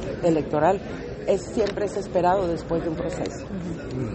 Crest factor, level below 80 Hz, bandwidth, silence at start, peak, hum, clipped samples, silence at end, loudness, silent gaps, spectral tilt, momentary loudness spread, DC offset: 16 dB; -44 dBFS; 8.8 kHz; 0 s; -8 dBFS; none; under 0.1%; 0 s; -25 LUFS; none; -6.5 dB/octave; 10 LU; under 0.1%